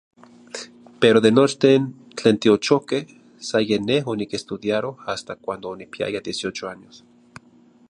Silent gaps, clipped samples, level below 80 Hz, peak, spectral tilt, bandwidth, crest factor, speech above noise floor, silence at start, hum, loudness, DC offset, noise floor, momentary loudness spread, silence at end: none; under 0.1%; -62 dBFS; -2 dBFS; -5 dB/octave; 11 kHz; 20 dB; 33 dB; 0.55 s; none; -21 LUFS; under 0.1%; -53 dBFS; 19 LU; 1.15 s